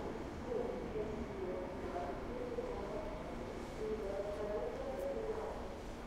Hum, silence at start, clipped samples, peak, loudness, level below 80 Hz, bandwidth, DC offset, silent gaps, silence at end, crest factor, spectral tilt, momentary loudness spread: none; 0 s; under 0.1%; -28 dBFS; -43 LUFS; -52 dBFS; 16 kHz; under 0.1%; none; 0 s; 14 dB; -6.5 dB/octave; 4 LU